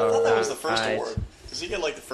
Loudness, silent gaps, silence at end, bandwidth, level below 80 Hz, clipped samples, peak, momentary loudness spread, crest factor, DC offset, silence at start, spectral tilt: -26 LUFS; none; 0 s; 13 kHz; -46 dBFS; under 0.1%; -10 dBFS; 13 LU; 16 dB; under 0.1%; 0 s; -3.5 dB/octave